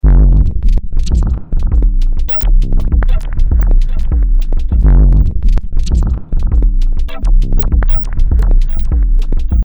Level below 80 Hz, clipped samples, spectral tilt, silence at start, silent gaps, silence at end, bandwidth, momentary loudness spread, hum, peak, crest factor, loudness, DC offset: -10 dBFS; under 0.1%; -8 dB/octave; 0.05 s; none; 0 s; over 20 kHz; 7 LU; none; 0 dBFS; 8 dB; -15 LUFS; under 0.1%